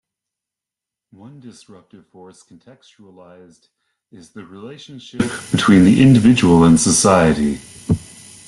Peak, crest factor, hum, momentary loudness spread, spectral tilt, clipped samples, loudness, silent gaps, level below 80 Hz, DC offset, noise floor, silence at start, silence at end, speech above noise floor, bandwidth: -2 dBFS; 16 dB; none; 25 LU; -5.5 dB/octave; under 0.1%; -13 LUFS; none; -44 dBFS; under 0.1%; -86 dBFS; 1.45 s; 0.5 s; 70 dB; 12.5 kHz